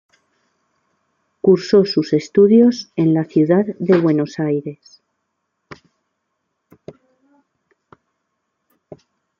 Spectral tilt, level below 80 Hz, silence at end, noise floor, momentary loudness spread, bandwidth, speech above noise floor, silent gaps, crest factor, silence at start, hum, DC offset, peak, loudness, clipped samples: -7.5 dB/octave; -64 dBFS; 4.65 s; -74 dBFS; 9 LU; 7.4 kHz; 59 dB; none; 16 dB; 1.45 s; none; under 0.1%; -2 dBFS; -16 LUFS; under 0.1%